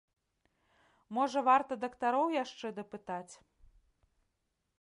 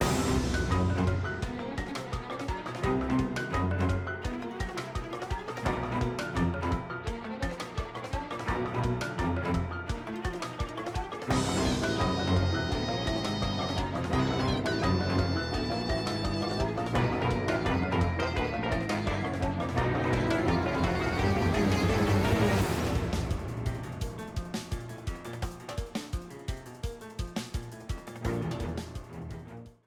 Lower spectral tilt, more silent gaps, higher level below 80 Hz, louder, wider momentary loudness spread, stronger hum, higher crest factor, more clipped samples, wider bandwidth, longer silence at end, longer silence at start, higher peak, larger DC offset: second, -4.5 dB/octave vs -6 dB/octave; neither; second, -74 dBFS vs -40 dBFS; about the same, -33 LUFS vs -31 LUFS; first, 15 LU vs 11 LU; neither; about the same, 20 dB vs 16 dB; neither; second, 11 kHz vs 17.5 kHz; first, 1.45 s vs 0.15 s; first, 1.1 s vs 0 s; about the same, -16 dBFS vs -14 dBFS; neither